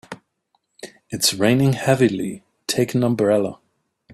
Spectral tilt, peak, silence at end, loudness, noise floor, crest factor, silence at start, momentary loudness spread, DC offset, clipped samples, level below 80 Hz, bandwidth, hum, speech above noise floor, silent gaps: -5 dB/octave; -2 dBFS; 0 s; -19 LUFS; -69 dBFS; 20 dB; 0.1 s; 23 LU; under 0.1%; under 0.1%; -58 dBFS; 14.5 kHz; none; 51 dB; none